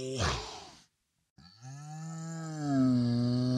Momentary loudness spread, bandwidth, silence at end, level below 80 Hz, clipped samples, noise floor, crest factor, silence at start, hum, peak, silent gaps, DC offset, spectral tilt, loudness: 21 LU; 11 kHz; 0 s; -52 dBFS; under 0.1%; -73 dBFS; 14 dB; 0 s; none; -18 dBFS; 1.30-1.36 s; under 0.1%; -6 dB/octave; -32 LUFS